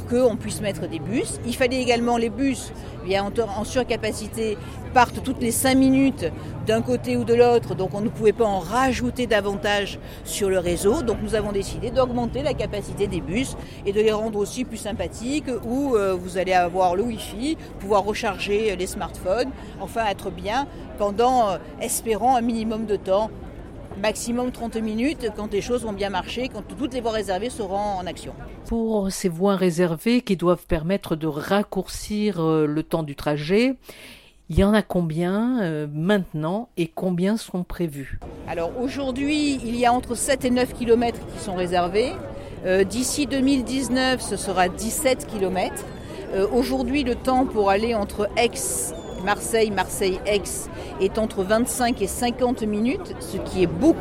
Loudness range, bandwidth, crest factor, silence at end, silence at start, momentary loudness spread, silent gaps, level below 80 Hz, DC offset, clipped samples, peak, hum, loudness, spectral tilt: 4 LU; 16.5 kHz; 20 dB; 0 s; 0 s; 9 LU; none; -40 dBFS; under 0.1%; under 0.1%; -2 dBFS; none; -23 LUFS; -5 dB/octave